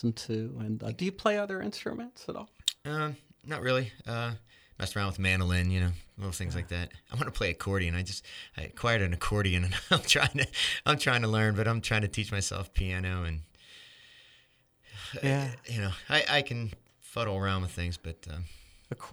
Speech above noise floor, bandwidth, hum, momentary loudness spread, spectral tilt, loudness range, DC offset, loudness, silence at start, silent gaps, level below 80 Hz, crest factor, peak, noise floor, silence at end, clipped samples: 35 dB; over 20 kHz; none; 16 LU; -4.5 dB/octave; 7 LU; under 0.1%; -30 LUFS; 0 s; none; -46 dBFS; 24 dB; -8 dBFS; -65 dBFS; 0 s; under 0.1%